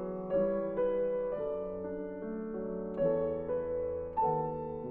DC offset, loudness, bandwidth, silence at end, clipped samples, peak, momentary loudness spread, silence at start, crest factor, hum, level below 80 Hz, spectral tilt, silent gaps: under 0.1%; -34 LUFS; 3.6 kHz; 0 s; under 0.1%; -18 dBFS; 8 LU; 0 s; 16 dB; none; -56 dBFS; -8.5 dB/octave; none